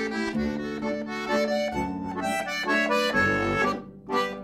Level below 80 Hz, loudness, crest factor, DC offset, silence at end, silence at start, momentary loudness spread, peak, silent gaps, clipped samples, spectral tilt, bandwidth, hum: -50 dBFS; -26 LUFS; 14 dB; under 0.1%; 0 s; 0 s; 8 LU; -12 dBFS; none; under 0.1%; -4.5 dB/octave; 15.5 kHz; none